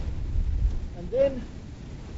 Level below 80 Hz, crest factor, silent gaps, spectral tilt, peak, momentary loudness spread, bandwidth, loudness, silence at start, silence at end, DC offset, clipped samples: -30 dBFS; 16 dB; none; -8 dB/octave; -12 dBFS; 16 LU; 7.8 kHz; -29 LUFS; 0 s; 0 s; under 0.1%; under 0.1%